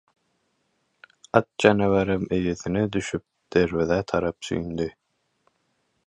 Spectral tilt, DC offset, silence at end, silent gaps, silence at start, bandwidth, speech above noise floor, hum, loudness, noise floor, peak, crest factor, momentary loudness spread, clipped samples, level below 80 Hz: -6 dB/octave; under 0.1%; 1.15 s; none; 1.35 s; 11 kHz; 49 dB; none; -24 LUFS; -72 dBFS; 0 dBFS; 24 dB; 11 LU; under 0.1%; -48 dBFS